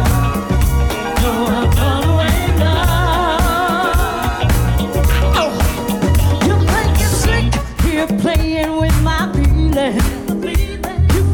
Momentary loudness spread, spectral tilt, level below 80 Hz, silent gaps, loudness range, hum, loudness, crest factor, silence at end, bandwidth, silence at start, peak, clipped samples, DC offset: 4 LU; -5.5 dB/octave; -18 dBFS; none; 1 LU; none; -15 LUFS; 12 dB; 0 s; 19 kHz; 0 s; -2 dBFS; under 0.1%; under 0.1%